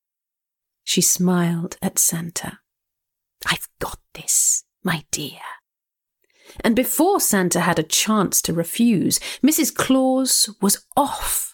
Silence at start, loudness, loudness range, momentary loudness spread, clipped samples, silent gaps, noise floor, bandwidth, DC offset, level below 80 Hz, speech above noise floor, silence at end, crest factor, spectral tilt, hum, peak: 0.85 s; -19 LUFS; 5 LU; 13 LU; under 0.1%; none; -86 dBFS; 19 kHz; under 0.1%; -48 dBFS; 66 dB; 0.05 s; 16 dB; -3 dB/octave; none; -6 dBFS